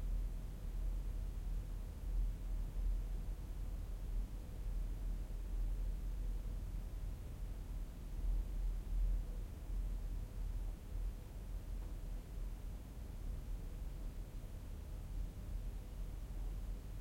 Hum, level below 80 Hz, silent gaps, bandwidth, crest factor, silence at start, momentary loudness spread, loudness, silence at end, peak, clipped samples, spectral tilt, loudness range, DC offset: none; -42 dBFS; none; 16 kHz; 12 dB; 0 s; 6 LU; -47 LUFS; 0 s; -28 dBFS; under 0.1%; -6.5 dB/octave; 4 LU; under 0.1%